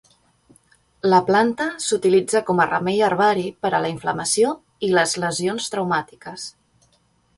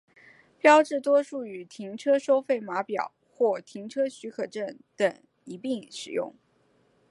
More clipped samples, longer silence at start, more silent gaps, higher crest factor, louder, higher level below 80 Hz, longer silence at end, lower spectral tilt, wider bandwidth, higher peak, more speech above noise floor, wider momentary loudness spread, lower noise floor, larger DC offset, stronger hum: neither; first, 1.05 s vs 0.65 s; neither; about the same, 18 dB vs 22 dB; first, -20 LUFS vs -27 LUFS; first, -60 dBFS vs -82 dBFS; about the same, 0.9 s vs 0.8 s; about the same, -4 dB/octave vs -4 dB/octave; about the same, 11.5 kHz vs 11.5 kHz; about the same, -4 dBFS vs -6 dBFS; about the same, 42 dB vs 40 dB; second, 8 LU vs 17 LU; second, -62 dBFS vs -66 dBFS; neither; neither